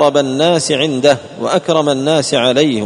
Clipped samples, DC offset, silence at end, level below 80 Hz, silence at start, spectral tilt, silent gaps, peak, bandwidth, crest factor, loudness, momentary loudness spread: under 0.1%; under 0.1%; 0 s; -56 dBFS; 0 s; -4.5 dB/octave; none; 0 dBFS; 11 kHz; 12 dB; -13 LUFS; 4 LU